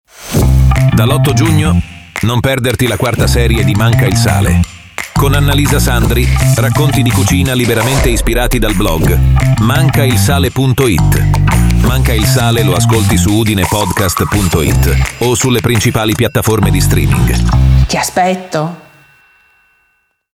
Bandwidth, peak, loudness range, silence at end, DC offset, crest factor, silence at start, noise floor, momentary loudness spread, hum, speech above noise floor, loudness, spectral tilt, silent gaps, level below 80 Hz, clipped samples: 17 kHz; 0 dBFS; 1 LU; 1.6 s; under 0.1%; 10 dB; 0.2 s; -59 dBFS; 3 LU; none; 49 dB; -11 LUFS; -5.5 dB/octave; none; -18 dBFS; under 0.1%